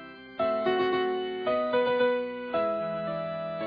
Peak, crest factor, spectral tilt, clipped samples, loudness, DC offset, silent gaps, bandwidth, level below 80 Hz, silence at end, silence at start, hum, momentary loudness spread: -14 dBFS; 14 dB; -8 dB/octave; under 0.1%; -28 LUFS; under 0.1%; none; 5.2 kHz; -66 dBFS; 0 s; 0 s; none; 7 LU